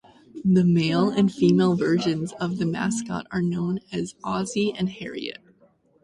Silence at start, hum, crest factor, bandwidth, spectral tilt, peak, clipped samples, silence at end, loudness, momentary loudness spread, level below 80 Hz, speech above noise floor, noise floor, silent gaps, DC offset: 0.35 s; none; 16 dB; 11.5 kHz; -6.5 dB/octave; -8 dBFS; under 0.1%; 0.7 s; -24 LUFS; 11 LU; -58 dBFS; 37 dB; -60 dBFS; none; under 0.1%